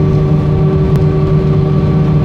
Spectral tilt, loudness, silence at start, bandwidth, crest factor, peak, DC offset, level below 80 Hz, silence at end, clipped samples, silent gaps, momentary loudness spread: -10 dB/octave; -11 LUFS; 0 s; 5.4 kHz; 10 dB; 0 dBFS; under 0.1%; -22 dBFS; 0 s; under 0.1%; none; 1 LU